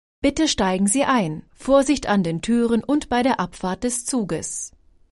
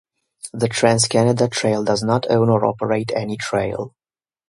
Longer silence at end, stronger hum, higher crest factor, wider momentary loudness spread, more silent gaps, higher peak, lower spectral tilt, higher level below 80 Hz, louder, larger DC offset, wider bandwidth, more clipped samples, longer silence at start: second, 0.45 s vs 0.6 s; neither; about the same, 16 dB vs 18 dB; about the same, 9 LU vs 11 LU; neither; second, -6 dBFS vs 0 dBFS; about the same, -4 dB/octave vs -5 dB/octave; first, -44 dBFS vs -54 dBFS; about the same, -21 LUFS vs -19 LUFS; neither; about the same, 11.5 kHz vs 11.5 kHz; neither; second, 0.25 s vs 0.45 s